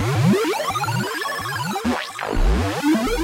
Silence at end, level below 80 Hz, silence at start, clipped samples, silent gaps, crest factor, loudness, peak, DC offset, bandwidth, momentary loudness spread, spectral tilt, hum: 0 s; -28 dBFS; 0 s; under 0.1%; none; 14 dB; -22 LUFS; -6 dBFS; under 0.1%; 16 kHz; 6 LU; -5.5 dB/octave; none